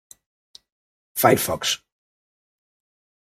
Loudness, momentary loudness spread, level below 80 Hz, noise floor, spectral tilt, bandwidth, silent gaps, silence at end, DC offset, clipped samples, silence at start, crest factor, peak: -21 LUFS; 11 LU; -60 dBFS; under -90 dBFS; -3.5 dB/octave; 16 kHz; none; 1.45 s; under 0.1%; under 0.1%; 1.15 s; 24 dB; -4 dBFS